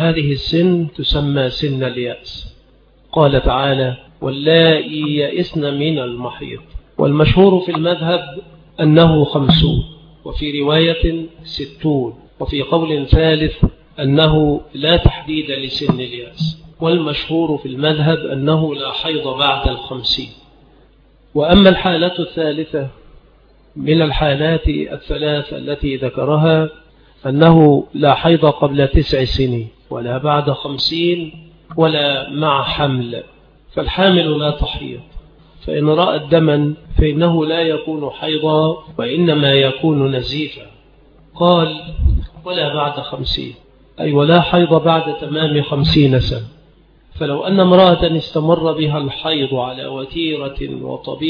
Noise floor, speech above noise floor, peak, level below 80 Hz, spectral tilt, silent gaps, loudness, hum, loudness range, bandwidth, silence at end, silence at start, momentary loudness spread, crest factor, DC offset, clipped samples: -49 dBFS; 34 dB; 0 dBFS; -28 dBFS; -8.5 dB/octave; none; -15 LUFS; none; 5 LU; 5.4 kHz; 0 s; 0 s; 13 LU; 16 dB; under 0.1%; under 0.1%